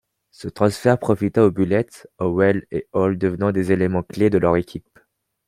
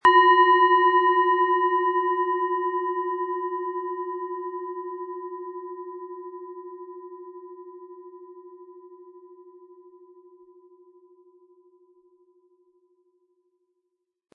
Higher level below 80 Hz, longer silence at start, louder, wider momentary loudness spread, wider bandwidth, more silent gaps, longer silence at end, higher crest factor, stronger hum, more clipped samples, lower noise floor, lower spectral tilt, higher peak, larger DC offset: first, -52 dBFS vs -78 dBFS; first, 0.4 s vs 0.05 s; about the same, -20 LUFS vs -22 LUFS; second, 11 LU vs 26 LU; first, 15 kHz vs 4.4 kHz; neither; second, 0.7 s vs 4.85 s; about the same, 18 dB vs 20 dB; neither; neither; second, -61 dBFS vs -79 dBFS; first, -7.5 dB/octave vs -4 dB/octave; first, -2 dBFS vs -6 dBFS; neither